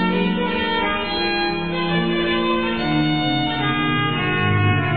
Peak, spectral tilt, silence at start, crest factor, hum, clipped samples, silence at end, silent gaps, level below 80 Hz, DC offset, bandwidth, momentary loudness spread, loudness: -6 dBFS; -8.5 dB/octave; 0 s; 14 dB; none; under 0.1%; 0 s; none; -42 dBFS; 1%; 4.8 kHz; 3 LU; -20 LUFS